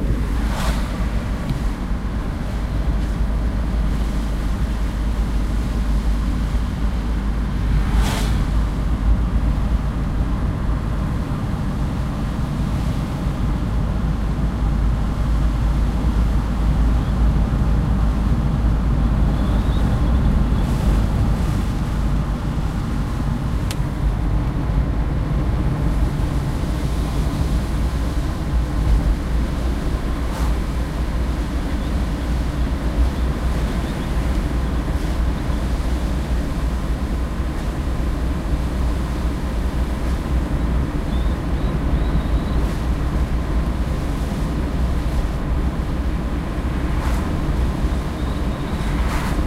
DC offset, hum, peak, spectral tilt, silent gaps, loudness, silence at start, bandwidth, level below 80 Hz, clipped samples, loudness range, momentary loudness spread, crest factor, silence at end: under 0.1%; none; -6 dBFS; -7 dB/octave; none; -22 LUFS; 0 s; 13 kHz; -20 dBFS; under 0.1%; 4 LU; 4 LU; 14 dB; 0 s